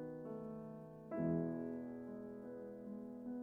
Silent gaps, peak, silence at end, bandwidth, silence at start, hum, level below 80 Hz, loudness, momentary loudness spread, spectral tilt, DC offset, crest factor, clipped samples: none; -28 dBFS; 0 s; 2.8 kHz; 0 s; none; -74 dBFS; -46 LUFS; 11 LU; -11 dB/octave; under 0.1%; 18 dB; under 0.1%